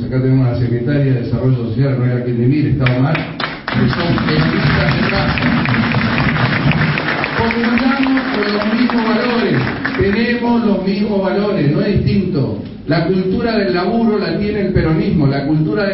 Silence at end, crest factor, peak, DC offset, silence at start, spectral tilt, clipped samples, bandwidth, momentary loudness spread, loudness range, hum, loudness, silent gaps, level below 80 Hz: 0 s; 14 dB; -2 dBFS; under 0.1%; 0 s; -11 dB/octave; under 0.1%; 5.8 kHz; 3 LU; 1 LU; none; -15 LUFS; none; -34 dBFS